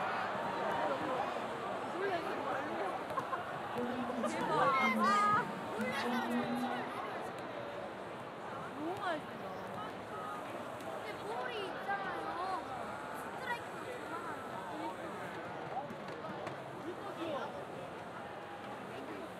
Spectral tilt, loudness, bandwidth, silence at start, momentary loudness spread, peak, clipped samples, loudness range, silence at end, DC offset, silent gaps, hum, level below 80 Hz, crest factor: -5 dB/octave; -39 LUFS; 15.5 kHz; 0 s; 11 LU; -20 dBFS; under 0.1%; 9 LU; 0 s; under 0.1%; none; none; -74 dBFS; 20 dB